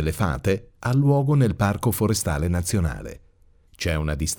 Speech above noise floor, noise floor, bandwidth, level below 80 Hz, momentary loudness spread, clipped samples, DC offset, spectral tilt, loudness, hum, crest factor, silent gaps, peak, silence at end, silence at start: 33 dB; -55 dBFS; over 20 kHz; -36 dBFS; 8 LU; under 0.1%; under 0.1%; -6 dB/octave; -23 LUFS; none; 14 dB; none; -8 dBFS; 0.05 s; 0 s